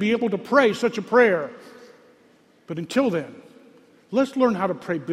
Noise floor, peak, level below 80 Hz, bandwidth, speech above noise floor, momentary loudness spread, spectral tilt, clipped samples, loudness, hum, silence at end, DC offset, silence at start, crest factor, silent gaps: -57 dBFS; -4 dBFS; -68 dBFS; 13.5 kHz; 35 dB; 14 LU; -6 dB/octave; under 0.1%; -22 LUFS; none; 0 s; under 0.1%; 0 s; 20 dB; none